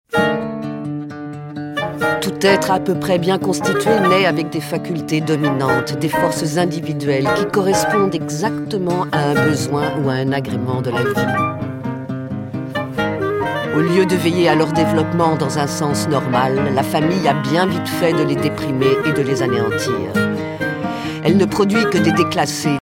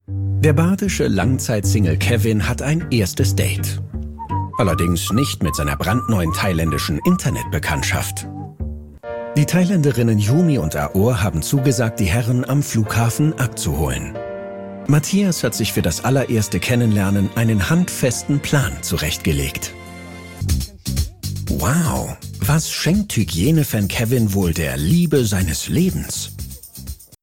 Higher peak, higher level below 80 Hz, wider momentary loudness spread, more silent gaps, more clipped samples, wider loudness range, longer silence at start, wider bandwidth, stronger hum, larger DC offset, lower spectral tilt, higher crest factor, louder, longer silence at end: about the same, 0 dBFS vs 0 dBFS; second, -50 dBFS vs -34 dBFS; second, 9 LU vs 12 LU; neither; neither; about the same, 3 LU vs 3 LU; about the same, 0.1 s vs 0.1 s; about the same, 17 kHz vs 16.5 kHz; neither; neither; about the same, -5.5 dB/octave vs -5.5 dB/octave; about the same, 16 dB vs 18 dB; about the same, -17 LUFS vs -19 LUFS; about the same, 0 s vs 0.1 s